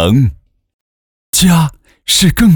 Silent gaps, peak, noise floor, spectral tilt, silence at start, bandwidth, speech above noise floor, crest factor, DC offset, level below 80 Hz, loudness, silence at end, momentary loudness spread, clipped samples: 0.74-1.33 s; -2 dBFS; under -90 dBFS; -4.5 dB/octave; 0 s; over 20 kHz; over 81 dB; 10 dB; under 0.1%; -30 dBFS; -11 LUFS; 0 s; 9 LU; under 0.1%